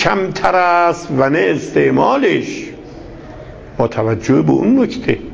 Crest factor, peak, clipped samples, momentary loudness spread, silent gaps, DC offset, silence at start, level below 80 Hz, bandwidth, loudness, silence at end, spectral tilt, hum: 14 dB; 0 dBFS; under 0.1%; 21 LU; none; under 0.1%; 0 s; -42 dBFS; 8 kHz; -14 LUFS; 0 s; -6.5 dB/octave; none